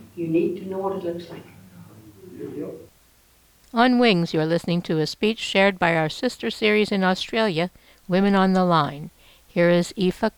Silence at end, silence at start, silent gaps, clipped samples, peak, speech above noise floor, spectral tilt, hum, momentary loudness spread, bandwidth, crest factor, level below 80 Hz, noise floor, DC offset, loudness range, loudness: 0.1 s; 0 s; none; under 0.1%; -4 dBFS; 36 dB; -6 dB/octave; none; 16 LU; 19.5 kHz; 18 dB; -56 dBFS; -57 dBFS; under 0.1%; 9 LU; -22 LUFS